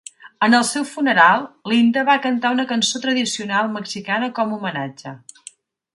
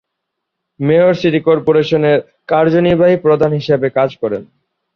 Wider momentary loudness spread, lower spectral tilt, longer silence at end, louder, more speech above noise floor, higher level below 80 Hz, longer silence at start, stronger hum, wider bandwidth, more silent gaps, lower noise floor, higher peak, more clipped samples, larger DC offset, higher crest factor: first, 13 LU vs 7 LU; second, -3 dB/octave vs -8 dB/octave; first, 0.8 s vs 0.5 s; second, -18 LUFS vs -13 LUFS; second, 27 dB vs 63 dB; second, -70 dBFS vs -50 dBFS; second, 0.25 s vs 0.8 s; neither; first, 11.5 kHz vs 6.6 kHz; neither; second, -45 dBFS vs -75 dBFS; about the same, 0 dBFS vs -2 dBFS; neither; neither; first, 18 dB vs 12 dB